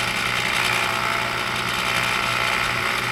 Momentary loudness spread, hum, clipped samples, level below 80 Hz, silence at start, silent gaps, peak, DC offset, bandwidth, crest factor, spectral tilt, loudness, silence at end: 3 LU; none; under 0.1%; -46 dBFS; 0 s; none; -8 dBFS; under 0.1%; over 20 kHz; 14 dB; -2 dB/octave; -21 LUFS; 0 s